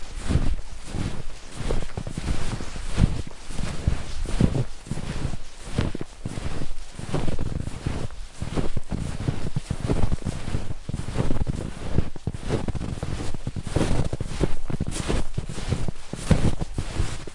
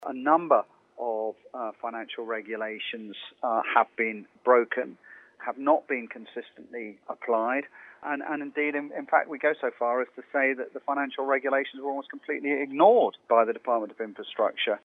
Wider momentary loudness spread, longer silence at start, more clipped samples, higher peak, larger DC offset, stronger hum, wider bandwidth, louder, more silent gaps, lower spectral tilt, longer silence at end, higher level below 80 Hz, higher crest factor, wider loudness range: second, 9 LU vs 15 LU; about the same, 0 s vs 0 s; neither; about the same, -4 dBFS vs -6 dBFS; neither; neither; first, 11.5 kHz vs 4 kHz; second, -30 LUFS vs -27 LUFS; neither; about the same, -6 dB/octave vs -6.5 dB/octave; about the same, 0 s vs 0.05 s; first, -30 dBFS vs under -90 dBFS; about the same, 20 dB vs 22 dB; about the same, 3 LU vs 5 LU